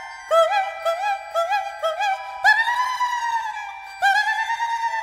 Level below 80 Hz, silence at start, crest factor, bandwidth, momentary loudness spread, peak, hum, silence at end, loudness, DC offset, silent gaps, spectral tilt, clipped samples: -64 dBFS; 0 s; 20 dB; 16 kHz; 8 LU; -2 dBFS; none; 0 s; -21 LUFS; under 0.1%; none; 2 dB/octave; under 0.1%